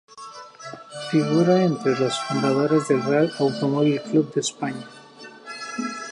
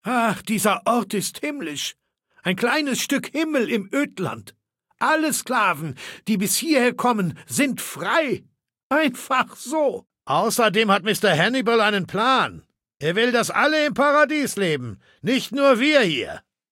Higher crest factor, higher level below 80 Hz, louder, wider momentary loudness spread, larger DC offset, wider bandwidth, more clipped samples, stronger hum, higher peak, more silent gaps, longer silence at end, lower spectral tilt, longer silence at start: about the same, 16 dB vs 18 dB; second, -72 dBFS vs -66 dBFS; about the same, -22 LUFS vs -21 LUFS; first, 20 LU vs 10 LU; neither; second, 11 kHz vs 17 kHz; neither; neither; about the same, -6 dBFS vs -4 dBFS; second, none vs 8.83-8.90 s; second, 0 s vs 0.3 s; first, -5.5 dB/octave vs -3.5 dB/octave; about the same, 0.15 s vs 0.05 s